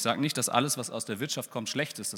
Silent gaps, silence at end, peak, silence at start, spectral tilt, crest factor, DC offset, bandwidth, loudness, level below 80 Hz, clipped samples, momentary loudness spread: none; 0 s; -8 dBFS; 0 s; -3 dB/octave; 24 dB; under 0.1%; 18.5 kHz; -30 LUFS; -80 dBFS; under 0.1%; 7 LU